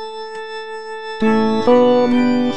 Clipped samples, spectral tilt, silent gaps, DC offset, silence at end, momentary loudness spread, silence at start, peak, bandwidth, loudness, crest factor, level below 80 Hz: under 0.1%; -6.5 dB/octave; none; 3%; 0 s; 16 LU; 0 s; -2 dBFS; 8.4 kHz; -14 LUFS; 14 dB; -52 dBFS